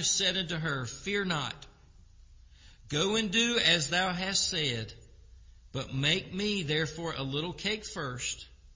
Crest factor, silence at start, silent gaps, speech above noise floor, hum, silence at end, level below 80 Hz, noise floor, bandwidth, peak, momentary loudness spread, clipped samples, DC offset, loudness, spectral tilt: 20 dB; 0 s; none; 25 dB; none; 0 s; -54 dBFS; -56 dBFS; 7.8 kHz; -12 dBFS; 12 LU; under 0.1%; under 0.1%; -30 LUFS; -3 dB/octave